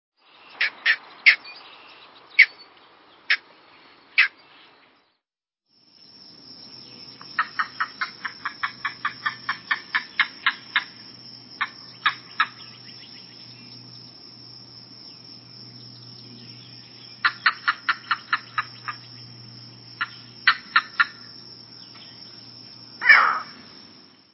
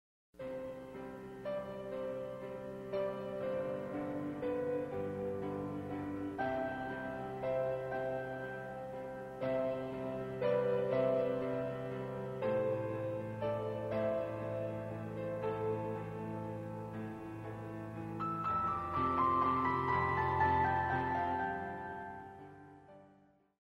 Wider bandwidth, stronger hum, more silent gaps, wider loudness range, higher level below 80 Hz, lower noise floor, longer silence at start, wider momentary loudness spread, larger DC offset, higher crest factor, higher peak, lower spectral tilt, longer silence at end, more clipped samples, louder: second, 6 kHz vs 13 kHz; neither; neither; first, 13 LU vs 8 LU; second, -74 dBFS vs -64 dBFS; first, -85 dBFS vs -67 dBFS; first, 0.6 s vs 0.35 s; first, 25 LU vs 12 LU; neither; first, 28 dB vs 18 dB; first, 0 dBFS vs -20 dBFS; second, -4 dB/octave vs -8 dB/octave; first, 0.8 s vs 0.5 s; neither; first, -22 LUFS vs -38 LUFS